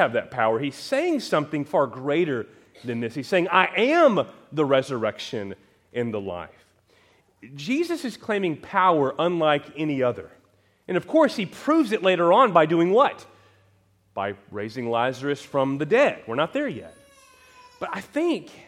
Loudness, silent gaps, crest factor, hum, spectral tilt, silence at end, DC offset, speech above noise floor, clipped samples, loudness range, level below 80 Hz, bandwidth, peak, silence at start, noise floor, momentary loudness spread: -23 LUFS; none; 22 dB; none; -6 dB/octave; 0.15 s; under 0.1%; 39 dB; under 0.1%; 8 LU; -70 dBFS; 14 kHz; -2 dBFS; 0 s; -62 dBFS; 14 LU